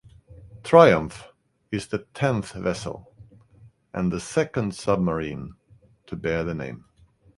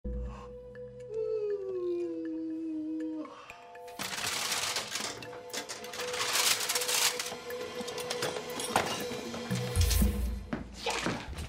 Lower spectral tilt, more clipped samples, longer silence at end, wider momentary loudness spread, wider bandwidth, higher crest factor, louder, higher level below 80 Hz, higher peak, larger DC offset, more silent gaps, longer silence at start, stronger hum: first, -6.5 dB/octave vs -3 dB/octave; neither; first, 0.6 s vs 0 s; first, 22 LU vs 15 LU; second, 11.5 kHz vs 16 kHz; about the same, 24 dB vs 20 dB; first, -23 LUFS vs -33 LUFS; second, -50 dBFS vs -42 dBFS; first, 0 dBFS vs -14 dBFS; neither; neither; first, 0.3 s vs 0.05 s; neither